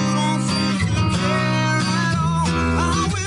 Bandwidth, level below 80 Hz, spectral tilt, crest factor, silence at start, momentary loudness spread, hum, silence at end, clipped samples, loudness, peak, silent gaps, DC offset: 11 kHz; -38 dBFS; -5 dB/octave; 10 dB; 0 s; 1 LU; none; 0 s; under 0.1%; -19 LUFS; -8 dBFS; none; under 0.1%